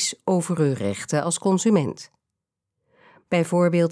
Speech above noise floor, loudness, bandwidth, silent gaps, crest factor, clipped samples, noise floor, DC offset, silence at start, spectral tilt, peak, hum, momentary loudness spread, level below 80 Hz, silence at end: 62 dB; -22 LUFS; 11 kHz; none; 16 dB; under 0.1%; -84 dBFS; under 0.1%; 0 s; -5.5 dB/octave; -8 dBFS; none; 7 LU; -68 dBFS; 0 s